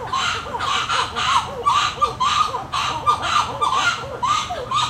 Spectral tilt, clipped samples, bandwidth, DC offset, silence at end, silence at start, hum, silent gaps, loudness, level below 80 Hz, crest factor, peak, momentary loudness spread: -2 dB/octave; under 0.1%; 16 kHz; under 0.1%; 0 s; 0 s; none; none; -20 LUFS; -44 dBFS; 18 dB; -4 dBFS; 4 LU